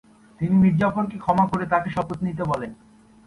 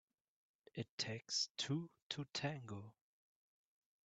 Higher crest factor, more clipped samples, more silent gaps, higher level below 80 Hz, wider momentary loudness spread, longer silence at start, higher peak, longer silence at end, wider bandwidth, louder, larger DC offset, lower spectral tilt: second, 18 dB vs 24 dB; neither; second, none vs 0.89-0.98 s, 1.51-1.55 s, 2.02-2.10 s; first, -50 dBFS vs -84 dBFS; second, 10 LU vs 13 LU; second, 0.4 s vs 0.75 s; first, -6 dBFS vs -24 dBFS; second, 0.5 s vs 1.15 s; first, 10.5 kHz vs 9 kHz; first, -22 LUFS vs -44 LUFS; neither; first, -9 dB/octave vs -3.5 dB/octave